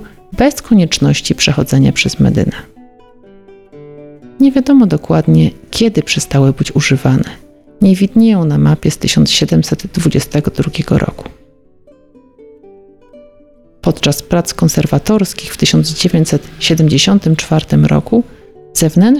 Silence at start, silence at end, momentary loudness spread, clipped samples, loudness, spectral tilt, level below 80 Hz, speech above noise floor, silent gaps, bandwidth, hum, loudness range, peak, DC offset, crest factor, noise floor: 0 s; 0 s; 6 LU; under 0.1%; -12 LUFS; -5.5 dB/octave; -34 dBFS; 34 dB; none; 15 kHz; none; 7 LU; 0 dBFS; under 0.1%; 12 dB; -45 dBFS